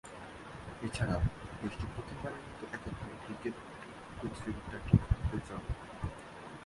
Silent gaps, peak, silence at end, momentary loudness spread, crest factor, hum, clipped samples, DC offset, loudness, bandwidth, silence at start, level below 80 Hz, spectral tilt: none; -12 dBFS; 0 s; 17 LU; 26 dB; none; under 0.1%; under 0.1%; -39 LUFS; 11.5 kHz; 0.05 s; -44 dBFS; -7 dB/octave